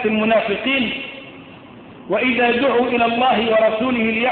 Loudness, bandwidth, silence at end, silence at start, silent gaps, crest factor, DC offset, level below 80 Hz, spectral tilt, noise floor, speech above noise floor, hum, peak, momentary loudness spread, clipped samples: -17 LUFS; 4.5 kHz; 0 s; 0 s; none; 12 dB; under 0.1%; -52 dBFS; -8.5 dB/octave; -40 dBFS; 22 dB; none; -6 dBFS; 10 LU; under 0.1%